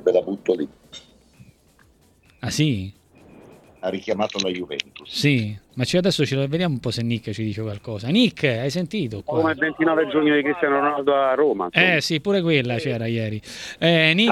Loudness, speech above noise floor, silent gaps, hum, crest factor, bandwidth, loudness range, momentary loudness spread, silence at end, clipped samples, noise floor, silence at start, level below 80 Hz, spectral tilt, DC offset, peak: -21 LUFS; 35 dB; none; none; 22 dB; 15 kHz; 9 LU; 12 LU; 0 s; under 0.1%; -57 dBFS; 0 s; -56 dBFS; -5.5 dB/octave; under 0.1%; 0 dBFS